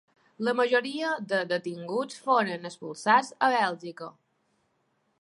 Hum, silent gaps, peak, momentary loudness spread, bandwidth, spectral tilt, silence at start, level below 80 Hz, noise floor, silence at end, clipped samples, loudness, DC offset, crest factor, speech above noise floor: none; none; -8 dBFS; 15 LU; 11.5 kHz; -4 dB/octave; 0.4 s; -84 dBFS; -73 dBFS; 1.1 s; under 0.1%; -27 LUFS; under 0.1%; 20 dB; 46 dB